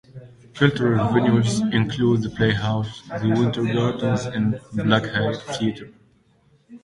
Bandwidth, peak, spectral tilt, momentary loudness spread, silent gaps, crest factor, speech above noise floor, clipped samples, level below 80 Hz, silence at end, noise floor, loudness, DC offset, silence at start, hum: 11.5 kHz; -2 dBFS; -6.5 dB/octave; 7 LU; none; 20 dB; 38 dB; under 0.1%; -50 dBFS; 0.05 s; -59 dBFS; -21 LUFS; under 0.1%; 0.15 s; none